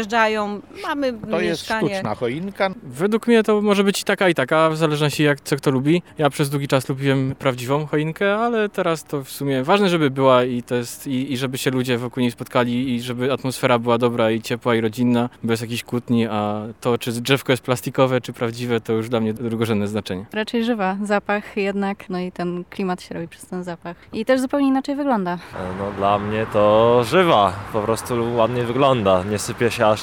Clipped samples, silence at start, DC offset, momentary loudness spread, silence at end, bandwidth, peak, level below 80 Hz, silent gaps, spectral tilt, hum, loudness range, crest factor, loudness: under 0.1%; 0 s; 0.1%; 9 LU; 0 s; 18.5 kHz; -2 dBFS; -54 dBFS; none; -5.5 dB/octave; none; 5 LU; 18 dB; -20 LUFS